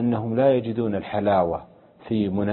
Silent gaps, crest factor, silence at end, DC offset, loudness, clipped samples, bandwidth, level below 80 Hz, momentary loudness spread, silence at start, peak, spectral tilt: none; 16 dB; 0 s; under 0.1%; -23 LUFS; under 0.1%; 4.3 kHz; -50 dBFS; 7 LU; 0 s; -6 dBFS; -12 dB/octave